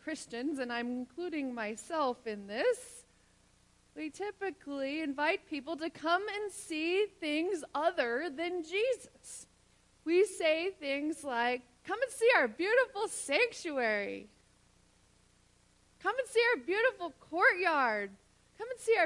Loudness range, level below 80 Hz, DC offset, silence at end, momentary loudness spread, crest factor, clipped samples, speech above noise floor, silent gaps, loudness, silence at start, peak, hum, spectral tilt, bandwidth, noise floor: 7 LU; -74 dBFS; under 0.1%; 0 s; 13 LU; 20 dB; under 0.1%; 34 dB; none; -33 LUFS; 0.05 s; -14 dBFS; 60 Hz at -75 dBFS; -2.5 dB/octave; 11.5 kHz; -67 dBFS